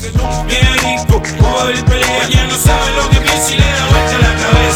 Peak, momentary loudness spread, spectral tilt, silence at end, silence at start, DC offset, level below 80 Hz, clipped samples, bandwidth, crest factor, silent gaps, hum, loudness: 0 dBFS; 3 LU; -4 dB/octave; 0 s; 0 s; under 0.1%; -16 dBFS; under 0.1%; 19 kHz; 10 dB; none; none; -11 LUFS